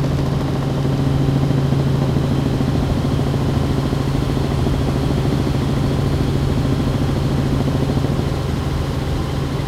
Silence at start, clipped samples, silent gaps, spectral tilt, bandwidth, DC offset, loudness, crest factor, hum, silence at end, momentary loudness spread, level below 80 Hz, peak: 0 s; under 0.1%; none; -7.5 dB/octave; 14.5 kHz; under 0.1%; -19 LUFS; 14 dB; none; 0 s; 4 LU; -28 dBFS; -4 dBFS